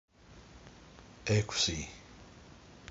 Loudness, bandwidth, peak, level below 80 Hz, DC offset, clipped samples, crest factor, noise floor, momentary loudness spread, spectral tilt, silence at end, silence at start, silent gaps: -33 LUFS; 7.6 kHz; -16 dBFS; -54 dBFS; under 0.1%; under 0.1%; 22 dB; -56 dBFS; 24 LU; -4 dB/octave; 0.05 s; 0.3 s; none